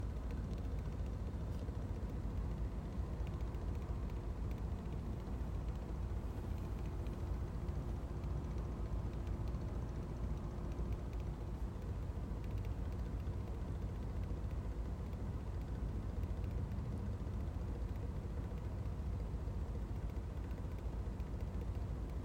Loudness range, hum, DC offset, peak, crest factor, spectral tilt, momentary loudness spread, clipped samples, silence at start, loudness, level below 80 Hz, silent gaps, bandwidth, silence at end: 1 LU; none; under 0.1%; -30 dBFS; 12 dB; -8 dB/octave; 2 LU; under 0.1%; 0 s; -44 LUFS; -44 dBFS; none; 15.5 kHz; 0 s